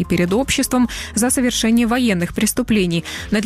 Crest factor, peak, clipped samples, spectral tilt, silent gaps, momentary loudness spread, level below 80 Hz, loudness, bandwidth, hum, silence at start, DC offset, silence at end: 12 dB; -4 dBFS; under 0.1%; -4 dB/octave; none; 4 LU; -36 dBFS; -17 LUFS; 15.5 kHz; none; 0 s; under 0.1%; 0 s